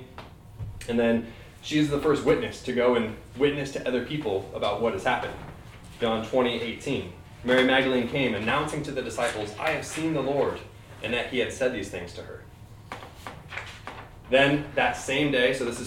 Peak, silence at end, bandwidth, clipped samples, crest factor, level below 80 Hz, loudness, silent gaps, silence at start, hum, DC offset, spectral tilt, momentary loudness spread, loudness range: -6 dBFS; 0 s; 16.5 kHz; under 0.1%; 22 dB; -50 dBFS; -26 LUFS; none; 0 s; none; under 0.1%; -5 dB/octave; 19 LU; 5 LU